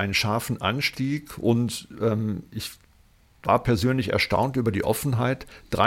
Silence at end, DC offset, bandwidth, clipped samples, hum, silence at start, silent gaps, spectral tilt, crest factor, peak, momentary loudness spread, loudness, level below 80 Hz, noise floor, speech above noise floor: 0 s; under 0.1%; 16.5 kHz; under 0.1%; none; 0 s; none; -5.5 dB/octave; 20 dB; -6 dBFS; 10 LU; -25 LUFS; -48 dBFS; -57 dBFS; 33 dB